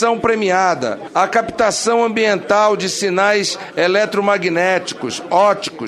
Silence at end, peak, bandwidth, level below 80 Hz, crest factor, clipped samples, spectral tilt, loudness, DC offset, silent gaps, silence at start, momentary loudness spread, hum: 0 s; -2 dBFS; 13.5 kHz; -56 dBFS; 14 dB; under 0.1%; -3.5 dB/octave; -16 LUFS; under 0.1%; none; 0 s; 5 LU; none